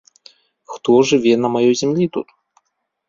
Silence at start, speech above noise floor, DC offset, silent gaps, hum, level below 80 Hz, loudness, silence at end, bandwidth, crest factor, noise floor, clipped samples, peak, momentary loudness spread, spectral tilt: 0.7 s; 56 dB; under 0.1%; none; none; -60 dBFS; -16 LUFS; 0.85 s; 7.6 kHz; 16 dB; -71 dBFS; under 0.1%; -2 dBFS; 16 LU; -5.5 dB/octave